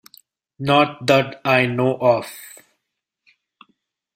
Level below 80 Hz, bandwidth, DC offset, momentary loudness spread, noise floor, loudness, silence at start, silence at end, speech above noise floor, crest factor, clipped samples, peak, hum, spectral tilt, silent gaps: -60 dBFS; 16 kHz; under 0.1%; 17 LU; -79 dBFS; -18 LUFS; 0.6 s; 1.65 s; 61 dB; 20 dB; under 0.1%; -2 dBFS; none; -5.5 dB/octave; none